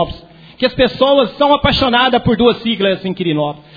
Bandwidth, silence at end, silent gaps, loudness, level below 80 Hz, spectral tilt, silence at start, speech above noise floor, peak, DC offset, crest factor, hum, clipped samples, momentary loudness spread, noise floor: 5 kHz; 0.15 s; none; -13 LUFS; -36 dBFS; -7 dB/octave; 0 s; 20 dB; 0 dBFS; under 0.1%; 14 dB; none; under 0.1%; 7 LU; -34 dBFS